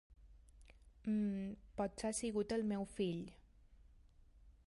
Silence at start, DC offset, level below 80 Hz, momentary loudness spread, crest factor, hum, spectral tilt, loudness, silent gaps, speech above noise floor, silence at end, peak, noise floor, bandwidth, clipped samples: 0.1 s; under 0.1%; -64 dBFS; 9 LU; 16 dB; none; -5.5 dB/octave; -41 LUFS; none; 25 dB; 0.15 s; -28 dBFS; -65 dBFS; 11.5 kHz; under 0.1%